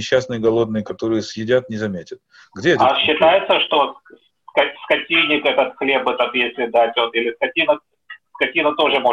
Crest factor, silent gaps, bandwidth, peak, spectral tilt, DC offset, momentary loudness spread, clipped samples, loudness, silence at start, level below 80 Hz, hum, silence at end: 16 dB; none; 8 kHz; -2 dBFS; -4.5 dB/octave; under 0.1%; 8 LU; under 0.1%; -18 LUFS; 0 s; -58 dBFS; none; 0 s